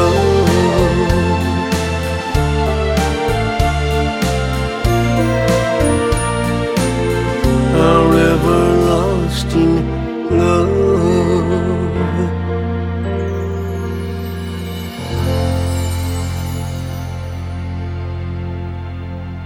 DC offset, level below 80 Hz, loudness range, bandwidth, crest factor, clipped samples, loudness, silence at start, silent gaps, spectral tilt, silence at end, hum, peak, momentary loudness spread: under 0.1%; -26 dBFS; 7 LU; 16.5 kHz; 14 dB; under 0.1%; -16 LUFS; 0 s; none; -6.5 dB/octave; 0 s; none; 0 dBFS; 11 LU